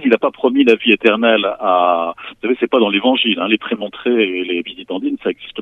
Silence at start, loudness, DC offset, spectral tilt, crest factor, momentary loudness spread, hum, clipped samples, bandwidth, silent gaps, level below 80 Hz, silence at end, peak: 0 s; -15 LUFS; under 0.1%; -6 dB/octave; 16 dB; 11 LU; none; under 0.1%; 6.8 kHz; none; -60 dBFS; 0 s; 0 dBFS